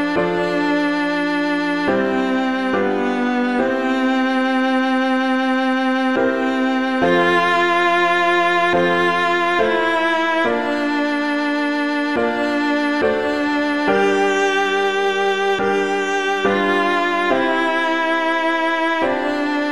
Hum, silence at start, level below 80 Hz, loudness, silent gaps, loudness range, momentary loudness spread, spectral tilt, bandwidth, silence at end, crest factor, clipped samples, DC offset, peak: none; 0 s; -54 dBFS; -18 LUFS; none; 3 LU; 4 LU; -4.5 dB/octave; 12.5 kHz; 0 s; 14 dB; under 0.1%; 0.5%; -4 dBFS